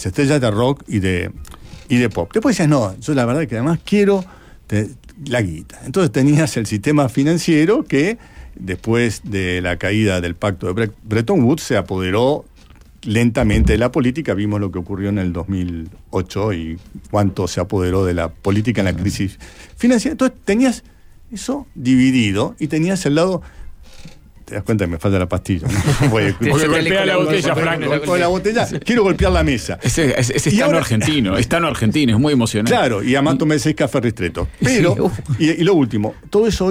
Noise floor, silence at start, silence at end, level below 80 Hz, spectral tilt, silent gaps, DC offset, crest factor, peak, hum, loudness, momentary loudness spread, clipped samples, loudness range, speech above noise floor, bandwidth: -44 dBFS; 0 s; 0 s; -34 dBFS; -6 dB/octave; none; under 0.1%; 12 dB; -4 dBFS; none; -17 LUFS; 9 LU; under 0.1%; 4 LU; 27 dB; 16 kHz